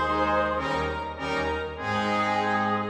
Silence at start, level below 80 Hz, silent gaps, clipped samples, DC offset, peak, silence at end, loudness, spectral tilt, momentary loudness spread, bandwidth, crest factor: 0 s; -44 dBFS; none; under 0.1%; under 0.1%; -12 dBFS; 0 s; -26 LUFS; -5.5 dB/octave; 6 LU; 12 kHz; 14 dB